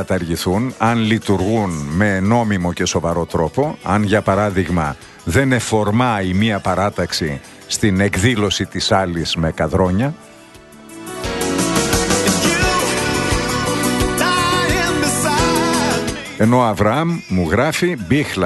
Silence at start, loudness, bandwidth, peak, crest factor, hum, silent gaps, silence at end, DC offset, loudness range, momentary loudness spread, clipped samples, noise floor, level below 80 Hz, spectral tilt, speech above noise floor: 0 s; -17 LUFS; 12.5 kHz; 0 dBFS; 16 dB; none; none; 0 s; under 0.1%; 2 LU; 5 LU; under 0.1%; -41 dBFS; -36 dBFS; -4.5 dB/octave; 24 dB